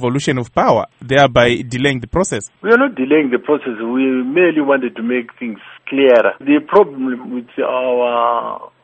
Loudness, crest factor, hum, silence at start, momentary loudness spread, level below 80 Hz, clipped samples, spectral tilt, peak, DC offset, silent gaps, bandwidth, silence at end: -15 LUFS; 14 dB; none; 0 s; 11 LU; -44 dBFS; under 0.1%; -5.5 dB/octave; 0 dBFS; under 0.1%; none; 8.8 kHz; 0.15 s